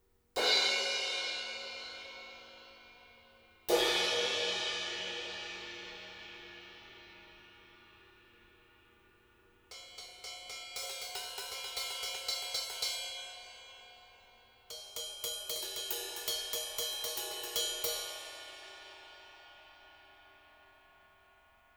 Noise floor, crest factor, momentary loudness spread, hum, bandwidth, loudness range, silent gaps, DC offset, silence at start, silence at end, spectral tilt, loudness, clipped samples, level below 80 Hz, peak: -66 dBFS; 24 dB; 24 LU; none; over 20 kHz; 18 LU; none; under 0.1%; 0.35 s; 0.75 s; 0.5 dB/octave; -35 LUFS; under 0.1%; -70 dBFS; -16 dBFS